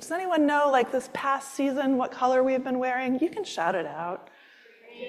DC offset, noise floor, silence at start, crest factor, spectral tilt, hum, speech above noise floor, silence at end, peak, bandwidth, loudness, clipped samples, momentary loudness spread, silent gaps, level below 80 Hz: under 0.1%; -54 dBFS; 0 s; 16 dB; -4 dB/octave; none; 28 dB; 0 s; -10 dBFS; 13.5 kHz; -26 LUFS; under 0.1%; 8 LU; none; -74 dBFS